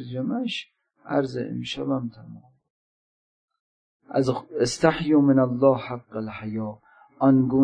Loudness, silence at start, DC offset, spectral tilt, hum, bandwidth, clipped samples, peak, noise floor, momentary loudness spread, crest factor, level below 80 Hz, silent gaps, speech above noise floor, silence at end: -24 LUFS; 0 s; under 0.1%; -6.5 dB/octave; none; 10.5 kHz; under 0.1%; -4 dBFS; under -90 dBFS; 14 LU; 20 dB; -58 dBFS; 2.70-3.48 s, 3.60-4.00 s; over 67 dB; 0 s